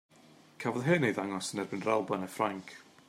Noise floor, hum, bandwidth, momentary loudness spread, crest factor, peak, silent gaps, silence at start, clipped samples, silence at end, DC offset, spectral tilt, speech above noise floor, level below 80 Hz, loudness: -59 dBFS; none; 16 kHz; 9 LU; 20 dB; -14 dBFS; none; 0.6 s; under 0.1%; 0.25 s; under 0.1%; -5.5 dB/octave; 27 dB; -78 dBFS; -32 LUFS